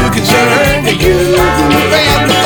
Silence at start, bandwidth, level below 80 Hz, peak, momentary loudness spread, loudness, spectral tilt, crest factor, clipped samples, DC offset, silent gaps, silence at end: 0 s; over 20 kHz; -24 dBFS; 0 dBFS; 2 LU; -9 LUFS; -4.5 dB/octave; 8 dB; under 0.1%; under 0.1%; none; 0 s